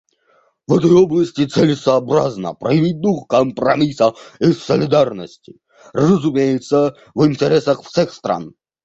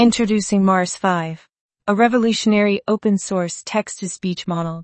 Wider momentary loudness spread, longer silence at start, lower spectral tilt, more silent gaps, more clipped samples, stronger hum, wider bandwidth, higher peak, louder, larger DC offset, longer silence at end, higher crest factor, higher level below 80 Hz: about the same, 9 LU vs 10 LU; first, 0.7 s vs 0 s; first, -7 dB/octave vs -5 dB/octave; second, none vs 1.60-1.69 s; neither; neither; about the same, 8 kHz vs 8.8 kHz; about the same, -2 dBFS vs 0 dBFS; first, -16 LUFS vs -19 LUFS; neither; first, 0.35 s vs 0 s; about the same, 14 dB vs 18 dB; about the same, -52 dBFS vs -56 dBFS